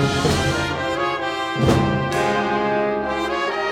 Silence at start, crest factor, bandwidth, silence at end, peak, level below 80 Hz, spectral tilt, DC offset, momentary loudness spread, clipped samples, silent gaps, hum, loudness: 0 s; 16 dB; 16.5 kHz; 0 s; -4 dBFS; -40 dBFS; -5 dB/octave; under 0.1%; 4 LU; under 0.1%; none; none; -20 LUFS